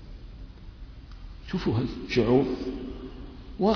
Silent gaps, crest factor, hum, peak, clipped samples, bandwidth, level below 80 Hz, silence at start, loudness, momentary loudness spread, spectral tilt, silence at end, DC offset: none; 18 dB; none; -10 dBFS; under 0.1%; 5.4 kHz; -42 dBFS; 0 s; -27 LUFS; 23 LU; -7.5 dB/octave; 0 s; under 0.1%